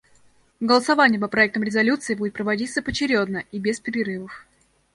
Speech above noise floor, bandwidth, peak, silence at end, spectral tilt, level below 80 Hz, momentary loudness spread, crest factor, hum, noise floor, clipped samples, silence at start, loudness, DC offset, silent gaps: 35 dB; 11.5 kHz; -4 dBFS; 0.5 s; -4.5 dB/octave; -54 dBFS; 10 LU; 20 dB; none; -56 dBFS; under 0.1%; 0.6 s; -21 LUFS; under 0.1%; none